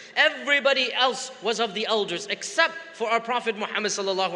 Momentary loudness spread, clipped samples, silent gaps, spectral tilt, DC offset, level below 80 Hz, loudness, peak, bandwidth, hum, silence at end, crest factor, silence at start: 8 LU; under 0.1%; none; -1.5 dB/octave; under 0.1%; -80 dBFS; -24 LUFS; -4 dBFS; 11 kHz; none; 0 s; 20 dB; 0 s